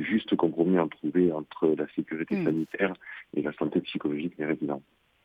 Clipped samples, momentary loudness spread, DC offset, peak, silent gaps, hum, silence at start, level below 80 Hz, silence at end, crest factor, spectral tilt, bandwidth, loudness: under 0.1%; 7 LU; under 0.1%; -10 dBFS; none; none; 0 s; -68 dBFS; 0.45 s; 18 dB; -9 dB/octave; 5.2 kHz; -29 LUFS